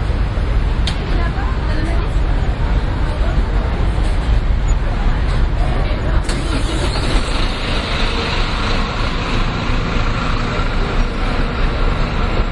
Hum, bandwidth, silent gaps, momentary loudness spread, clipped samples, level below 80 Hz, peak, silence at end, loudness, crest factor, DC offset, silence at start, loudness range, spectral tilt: none; 11 kHz; none; 1 LU; under 0.1%; -18 dBFS; -2 dBFS; 0 s; -19 LUFS; 14 dB; under 0.1%; 0 s; 1 LU; -6 dB/octave